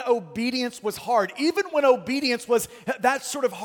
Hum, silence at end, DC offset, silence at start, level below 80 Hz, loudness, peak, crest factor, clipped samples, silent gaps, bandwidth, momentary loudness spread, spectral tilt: none; 0 s; under 0.1%; 0 s; -66 dBFS; -24 LUFS; -6 dBFS; 18 dB; under 0.1%; none; 17.5 kHz; 6 LU; -3 dB/octave